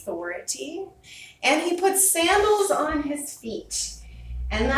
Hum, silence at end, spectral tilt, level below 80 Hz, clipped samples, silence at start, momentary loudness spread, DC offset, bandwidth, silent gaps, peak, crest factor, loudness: none; 0 s; -2.5 dB/octave; -40 dBFS; under 0.1%; 0 s; 21 LU; under 0.1%; 16 kHz; none; -6 dBFS; 18 dB; -23 LUFS